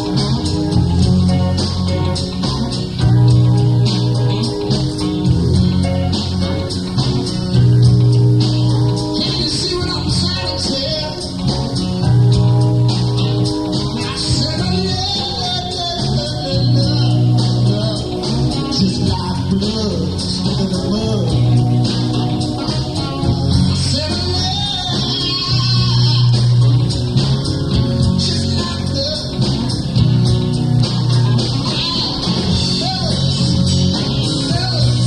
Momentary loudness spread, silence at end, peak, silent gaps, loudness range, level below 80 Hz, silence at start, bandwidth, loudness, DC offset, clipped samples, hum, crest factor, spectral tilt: 6 LU; 0 s; -2 dBFS; none; 3 LU; -28 dBFS; 0 s; 10.5 kHz; -16 LUFS; under 0.1%; under 0.1%; none; 14 dB; -6 dB/octave